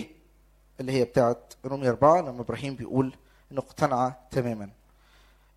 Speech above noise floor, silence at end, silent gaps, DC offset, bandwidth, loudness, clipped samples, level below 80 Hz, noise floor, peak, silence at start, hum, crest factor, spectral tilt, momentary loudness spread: 33 dB; 0.85 s; none; under 0.1%; 14 kHz; -27 LUFS; under 0.1%; -56 dBFS; -60 dBFS; -6 dBFS; 0 s; none; 22 dB; -7 dB/octave; 15 LU